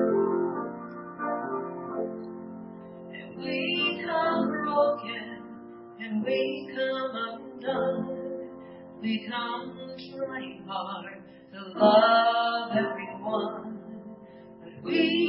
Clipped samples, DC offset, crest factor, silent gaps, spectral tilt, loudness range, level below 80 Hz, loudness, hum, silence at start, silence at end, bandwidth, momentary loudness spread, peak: under 0.1%; under 0.1%; 22 dB; none; -9 dB/octave; 9 LU; -72 dBFS; -28 LUFS; none; 0 s; 0 s; 5.8 kHz; 19 LU; -8 dBFS